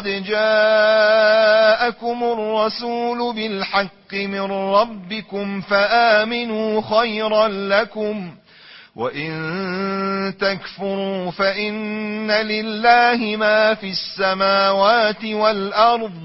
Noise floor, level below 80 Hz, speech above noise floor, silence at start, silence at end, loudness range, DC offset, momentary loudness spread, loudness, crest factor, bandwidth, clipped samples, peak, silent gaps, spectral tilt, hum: -45 dBFS; -58 dBFS; 26 dB; 0 s; 0 s; 6 LU; under 0.1%; 12 LU; -18 LUFS; 18 dB; 6 kHz; under 0.1%; -2 dBFS; none; -7.5 dB/octave; none